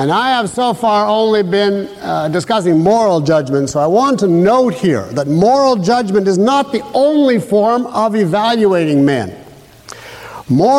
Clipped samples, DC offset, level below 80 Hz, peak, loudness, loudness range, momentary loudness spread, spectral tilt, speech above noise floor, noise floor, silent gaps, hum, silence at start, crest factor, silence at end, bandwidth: under 0.1%; under 0.1%; -50 dBFS; -2 dBFS; -13 LUFS; 1 LU; 6 LU; -6 dB/octave; 25 dB; -37 dBFS; none; none; 0 s; 10 dB; 0 s; 15.5 kHz